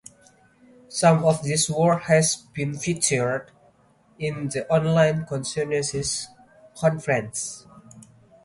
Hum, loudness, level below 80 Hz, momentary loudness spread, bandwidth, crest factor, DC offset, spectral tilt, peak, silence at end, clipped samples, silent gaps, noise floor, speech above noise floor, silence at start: none; -23 LUFS; -56 dBFS; 12 LU; 11.5 kHz; 20 dB; under 0.1%; -4.5 dB/octave; -4 dBFS; 0.45 s; under 0.1%; none; -59 dBFS; 36 dB; 0.9 s